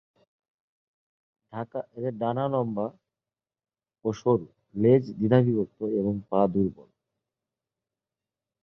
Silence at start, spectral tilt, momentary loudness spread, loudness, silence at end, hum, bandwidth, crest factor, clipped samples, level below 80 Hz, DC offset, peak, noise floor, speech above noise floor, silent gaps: 1.55 s; -9.5 dB/octave; 14 LU; -26 LUFS; 1.8 s; none; 6.8 kHz; 22 dB; under 0.1%; -62 dBFS; under 0.1%; -8 dBFS; under -90 dBFS; over 65 dB; none